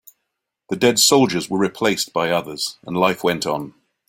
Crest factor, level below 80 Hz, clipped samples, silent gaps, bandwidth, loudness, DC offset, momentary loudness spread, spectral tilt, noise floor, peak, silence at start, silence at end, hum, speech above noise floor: 18 dB; -58 dBFS; under 0.1%; none; 16.5 kHz; -19 LUFS; under 0.1%; 13 LU; -3 dB/octave; -78 dBFS; -2 dBFS; 0.7 s; 0.4 s; none; 60 dB